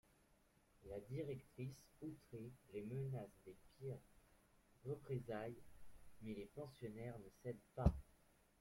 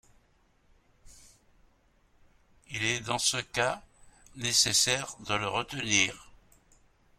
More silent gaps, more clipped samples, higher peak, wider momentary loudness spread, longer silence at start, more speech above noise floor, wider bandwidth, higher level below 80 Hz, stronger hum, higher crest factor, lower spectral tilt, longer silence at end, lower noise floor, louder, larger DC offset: neither; neither; second, -22 dBFS vs -10 dBFS; first, 14 LU vs 11 LU; second, 0.8 s vs 1.05 s; second, 27 dB vs 37 dB; about the same, 16.5 kHz vs 16.5 kHz; about the same, -58 dBFS vs -60 dBFS; neither; about the same, 28 dB vs 24 dB; first, -8 dB/octave vs -1.5 dB/octave; second, 0.45 s vs 0.95 s; first, -76 dBFS vs -67 dBFS; second, -51 LUFS vs -28 LUFS; neither